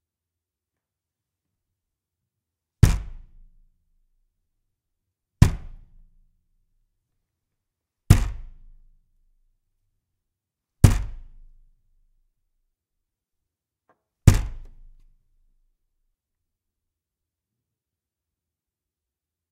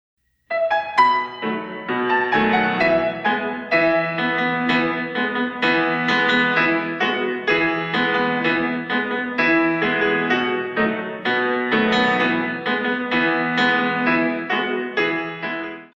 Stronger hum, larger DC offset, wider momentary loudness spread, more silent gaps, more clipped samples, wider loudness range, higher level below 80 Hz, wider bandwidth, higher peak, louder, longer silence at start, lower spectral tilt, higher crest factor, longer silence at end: neither; neither; first, 20 LU vs 6 LU; neither; neither; about the same, 3 LU vs 1 LU; first, -34 dBFS vs -56 dBFS; first, 15.5 kHz vs 7.8 kHz; first, 0 dBFS vs -4 dBFS; about the same, -21 LUFS vs -19 LUFS; first, 2.85 s vs 0.5 s; about the same, -6.5 dB/octave vs -6 dB/octave; first, 28 dB vs 16 dB; first, 4.9 s vs 0.1 s